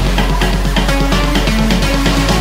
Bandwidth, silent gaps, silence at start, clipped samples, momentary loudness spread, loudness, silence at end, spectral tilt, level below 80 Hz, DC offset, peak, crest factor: 16.5 kHz; none; 0 s; under 0.1%; 2 LU; -14 LUFS; 0 s; -5 dB/octave; -16 dBFS; under 0.1%; 0 dBFS; 12 dB